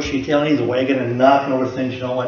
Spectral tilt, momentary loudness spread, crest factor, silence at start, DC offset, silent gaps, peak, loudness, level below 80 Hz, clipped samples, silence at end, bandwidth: -6.5 dB/octave; 8 LU; 18 dB; 0 s; under 0.1%; none; 0 dBFS; -18 LUFS; -46 dBFS; under 0.1%; 0 s; 7 kHz